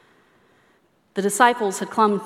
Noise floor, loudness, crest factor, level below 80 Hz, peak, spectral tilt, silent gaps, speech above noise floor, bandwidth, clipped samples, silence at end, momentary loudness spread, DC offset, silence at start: -61 dBFS; -20 LUFS; 22 dB; -78 dBFS; 0 dBFS; -3.5 dB/octave; none; 42 dB; 16 kHz; under 0.1%; 0 s; 9 LU; under 0.1%; 1.15 s